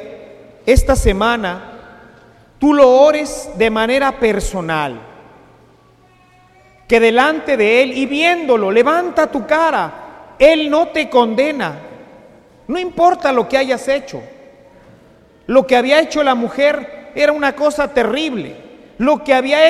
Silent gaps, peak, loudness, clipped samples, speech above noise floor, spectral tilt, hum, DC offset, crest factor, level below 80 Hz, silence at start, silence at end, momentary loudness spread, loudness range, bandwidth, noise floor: none; 0 dBFS; -14 LUFS; under 0.1%; 36 dB; -4.5 dB/octave; none; under 0.1%; 16 dB; -30 dBFS; 0 s; 0 s; 13 LU; 5 LU; 14.5 kHz; -49 dBFS